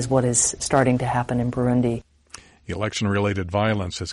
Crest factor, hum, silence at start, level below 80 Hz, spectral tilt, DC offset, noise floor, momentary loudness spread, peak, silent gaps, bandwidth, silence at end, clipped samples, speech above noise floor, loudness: 18 dB; none; 0 s; -46 dBFS; -4.5 dB/octave; under 0.1%; -47 dBFS; 9 LU; -4 dBFS; none; 11.5 kHz; 0 s; under 0.1%; 25 dB; -22 LUFS